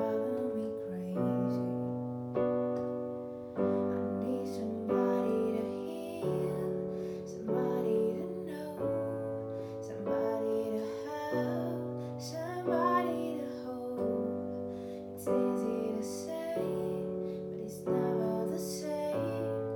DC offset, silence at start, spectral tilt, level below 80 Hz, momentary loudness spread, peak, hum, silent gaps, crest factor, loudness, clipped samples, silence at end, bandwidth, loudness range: under 0.1%; 0 s; -7 dB/octave; -70 dBFS; 9 LU; -18 dBFS; none; none; 16 dB; -35 LUFS; under 0.1%; 0 s; 19 kHz; 2 LU